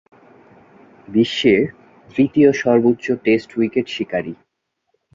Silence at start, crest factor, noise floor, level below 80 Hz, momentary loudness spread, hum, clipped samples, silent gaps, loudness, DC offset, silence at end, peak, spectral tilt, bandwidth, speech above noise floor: 1.1 s; 18 dB; -70 dBFS; -56 dBFS; 11 LU; none; under 0.1%; none; -18 LUFS; under 0.1%; 0.8 s; -2 dBFS; -6 dB/octave; 7.6 kHz; 54 dB